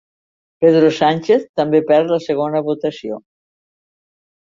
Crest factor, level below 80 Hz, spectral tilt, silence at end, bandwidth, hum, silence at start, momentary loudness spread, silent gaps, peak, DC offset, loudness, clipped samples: 16 dB; -62 dBFS; -7 dB/octave; 1.2 s; 7.4 kHz; none; 0.6 s; 12 LU; 1.49-1.54 s; -2 dBFS; under 0.1%; -16 LUFS; under 0.1%